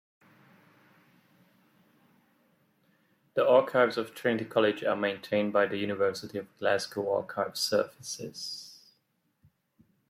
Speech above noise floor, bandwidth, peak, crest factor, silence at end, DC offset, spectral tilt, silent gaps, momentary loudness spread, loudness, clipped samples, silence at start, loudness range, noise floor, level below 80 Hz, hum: 46 dB; 16 kHz; -10 dBFS; 20 dB; 1.35 s; under 0.1%; -4 dB/octave; none; 14 LU; -29 LUFS; under 0.1%; 3.35 s; 5 LU; -75 dBFS; -78 dBFS; none